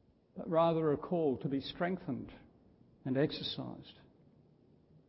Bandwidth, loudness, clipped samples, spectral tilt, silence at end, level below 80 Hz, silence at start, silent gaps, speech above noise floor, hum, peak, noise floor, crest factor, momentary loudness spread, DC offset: 5.6 kHz; -35 LUFS; under 0.1%; -5.5 dB/octave; 1.15 s; -68 dBFS; 0.35 s; none; 31 dB; none; -18 dBFS; -66 dBFS; 20 dB; 19 LU; under 0.1%